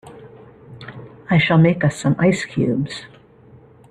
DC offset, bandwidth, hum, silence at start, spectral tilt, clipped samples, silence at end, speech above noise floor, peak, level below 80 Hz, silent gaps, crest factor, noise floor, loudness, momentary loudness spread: under 0.1%; 10.5 kHz; none; 0.05 s; -6.5 dB/octave; under 0.1%; 0.85 s; 30 dB; -2 dBFS; -52 dBFS; none; 18 dB; -47 dBFS; -18 LUFS; 23 LU